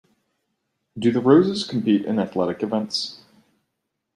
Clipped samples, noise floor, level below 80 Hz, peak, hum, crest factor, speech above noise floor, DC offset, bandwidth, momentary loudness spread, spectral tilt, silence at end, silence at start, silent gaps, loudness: under 0.1%; -78 dBFS; -64 dBFS; -2 dBFS; none; 20 dB; 58 dB; under 0.1%; 11.5 kHz; 10 LU; -6 dB/octave; 1 s; 0.95 s; none; -21 LUFS